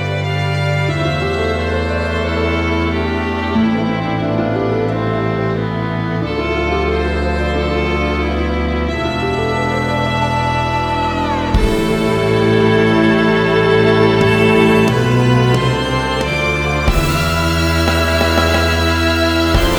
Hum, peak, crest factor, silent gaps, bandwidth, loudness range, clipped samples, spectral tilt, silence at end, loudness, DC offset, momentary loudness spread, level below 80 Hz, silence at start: none; 0 dBFS; 14 dB; none; over 20 kHz; 5 LU; under 0.1%; -6 dB/octave; 0 s; -15 LUFS; under 0.1%; 6 LU; -26 dBFS; 0 s